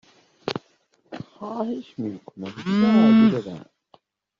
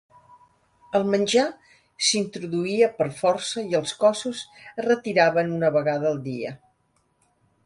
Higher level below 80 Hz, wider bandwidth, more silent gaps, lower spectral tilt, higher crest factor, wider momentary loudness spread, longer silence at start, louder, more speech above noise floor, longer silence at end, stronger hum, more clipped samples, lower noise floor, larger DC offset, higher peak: about the same, -64 dBFS vs -68 dBFS; second, 7 kHz vs 11.5 kHz; neither; first, -6 dB/octave vs -4 dB/octave; about the same, 16 dB vs 18 dB; first, 24 LU vs 10 LU; second, 0.45 s vs 0.9 s; about the same, -21 LUFS vs -23 LUFS; about the same, 43 dB vs 45 dB; second, 0.75 s vs 1.1 s; neither; neither; second, -63 dBFS vs -68 dBFS; neither; about the same, -6 dBFS vs -6 dBFS